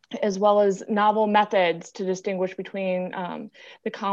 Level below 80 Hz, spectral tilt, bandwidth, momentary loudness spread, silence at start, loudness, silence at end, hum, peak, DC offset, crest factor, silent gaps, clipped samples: -74 dBFS; -5.5 dB/octave; 8 kHz; 14 LU; 0.1 s; -24 LUFS; 0 s; none; -6 dBFS; under 0.1%; 18 dB; none; under 0.1%